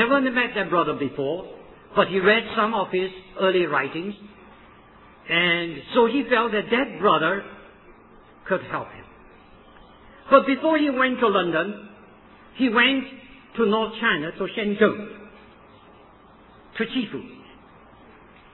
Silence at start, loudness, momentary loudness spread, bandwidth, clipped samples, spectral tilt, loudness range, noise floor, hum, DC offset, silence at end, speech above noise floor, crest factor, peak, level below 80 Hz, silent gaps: 0 s; -22 LUFS; 17 LU; 4.2 kHz; under 0.1%; -8.5 dB/octave; 6 LU; -50 dBFS; none; under 0.1%; 1.1 s; 28 dB; 22 dB; -2 dBFS; -58 dBFS; none